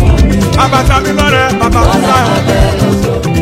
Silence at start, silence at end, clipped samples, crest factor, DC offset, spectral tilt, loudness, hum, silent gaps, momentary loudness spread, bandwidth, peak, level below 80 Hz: 0 s; 0 s; 0.5%; 8 dB; under 0.1%; -5.5 dB/octave; -9 LUFS; none; none; 3 LU; 16 kHz; 0 dBFS; -16 dBFS